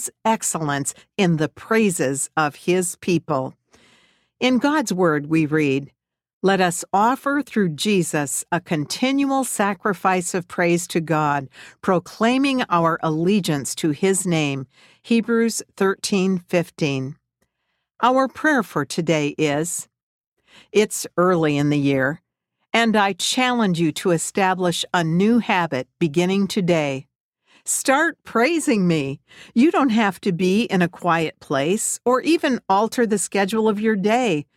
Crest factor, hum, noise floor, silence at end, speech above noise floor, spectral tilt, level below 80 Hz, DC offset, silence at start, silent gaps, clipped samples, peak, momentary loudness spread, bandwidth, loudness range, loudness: 16 dB; none; -75 dBFS; 0.15 s; 55 dB; -4.5 dB/octave; -62 dBFS; under 0.1%; 0 s; 6.33-6.41 s, 20.03-20.21 s, 20.27-20.36 s, 27.20-27.33 s; under 0.1%; -4 dBFS; 6 LU; 16 kHz; 2 LU; -20 LUFS